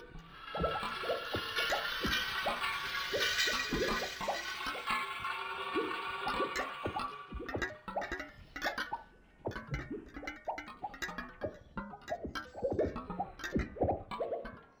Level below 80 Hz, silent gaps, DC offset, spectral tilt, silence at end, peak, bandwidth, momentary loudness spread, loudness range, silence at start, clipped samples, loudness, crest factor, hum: -52 dBFS; none; under 0.1%; -3.5 dB/octave; 0.1 s; -18 dBFS; over 20 kHz; 11 LU; 8 LU; 0 s; under 0.1%; -37 LUFS; 20 dB; none